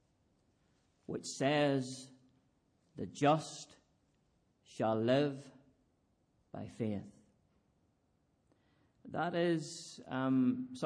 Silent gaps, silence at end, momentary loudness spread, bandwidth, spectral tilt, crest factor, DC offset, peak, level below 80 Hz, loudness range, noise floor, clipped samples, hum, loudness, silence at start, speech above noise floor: none; 0 s; 18 LU; 10.5 kHz; -5.5 dB/octave; 20 dB; under 0.1%; -18 dBFS; -78 dBFS; 11 LU; -76 dBFS; under 0.1%; none; -35 LUFS; 1.1 s; 41 dB